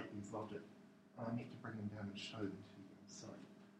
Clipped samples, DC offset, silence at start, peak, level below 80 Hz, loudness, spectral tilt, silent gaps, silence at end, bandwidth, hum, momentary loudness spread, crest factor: under 0.1%; under 0.1%; 0 s; -32 dBFS; -80 dBFS; -50 LUFS; -5.5 dB/octave; none; 0 s; 12 kHz; none; 13 LU; 18 dB